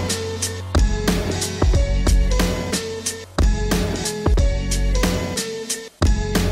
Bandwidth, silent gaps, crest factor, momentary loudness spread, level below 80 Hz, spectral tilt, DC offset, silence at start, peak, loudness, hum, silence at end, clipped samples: 16 kHz; none; 16 dB; 5 LU; -22 dBFS; -4.5 dB/octave; under 0.1%; 0 s; -4 dBFS; -21 LUFS; none; 0 s; under 0.1%